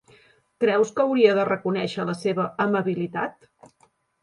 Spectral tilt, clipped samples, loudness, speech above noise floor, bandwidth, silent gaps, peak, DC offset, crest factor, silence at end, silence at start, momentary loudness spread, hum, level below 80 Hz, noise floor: -6.5 dB/octave; under 0.1%; -23 LUFS; 34 dB; 11.5 kHz; none; -4 dBFS; under 0.1%; 20 dB; 0.9 s; 0.6 s; 9 LU; none; -68 dBFS; -57 dBFS